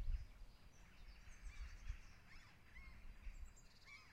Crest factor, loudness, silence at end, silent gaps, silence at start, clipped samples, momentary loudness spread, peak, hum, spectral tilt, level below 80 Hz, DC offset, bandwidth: 20 dB; -60 LUFS; 0 s; none; 0 s; under 0.1%; 10 LU; -34 dBFS; none; -4 dB/octave; -54 dBFS; under 0.1%; 11 kHz